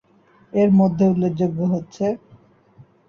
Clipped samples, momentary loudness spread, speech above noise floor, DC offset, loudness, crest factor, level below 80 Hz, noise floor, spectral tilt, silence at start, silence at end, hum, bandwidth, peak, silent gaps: under 0.1%; 9 LU; 33 dB; under 0.1%; -19 LUFS; 14 dB; -56 dBFS; -52 dBFS; -9.5 dB/octave; 0.55 s; 0.9 s; none; 6.8 kHz; -8 dBFS; none